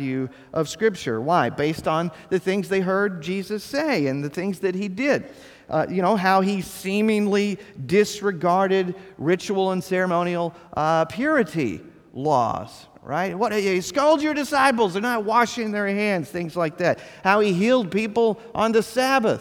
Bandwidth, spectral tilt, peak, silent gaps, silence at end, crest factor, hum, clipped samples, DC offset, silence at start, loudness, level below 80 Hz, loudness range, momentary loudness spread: 18 kHz; -5.5 dB/octave; -2 dBFS; none; 0 s; 20 dB; none; under 0.1%; under 0.1%; 0 s; -22 LUFS; -60 dBFS; 3 LU; 8 LU